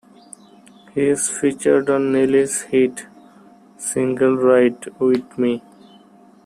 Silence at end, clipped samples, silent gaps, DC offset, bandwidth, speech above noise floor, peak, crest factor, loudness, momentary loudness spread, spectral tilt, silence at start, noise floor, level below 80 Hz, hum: 0.85 s; under 0.1%; none; under 0.1%; 15 kHz; 31 dB; -2 dBFS; 16 dB; -18 LUFS; 8 LU; -5 dB/octave; 0.95 s; -48 dBFS; -62 dBFS; none